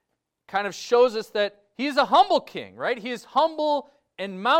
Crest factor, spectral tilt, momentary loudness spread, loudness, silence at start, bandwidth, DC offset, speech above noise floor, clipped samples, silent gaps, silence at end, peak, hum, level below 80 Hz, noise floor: 18 dB; -3.5 dB/octave; 11 LU; -24 LUFS; 0.5 s; 15.5 kHz; under 0.1%; 37 dB; under 0.1%; none; 0 s; -6 dBFS; none; -68 dBFS; -60 dBFS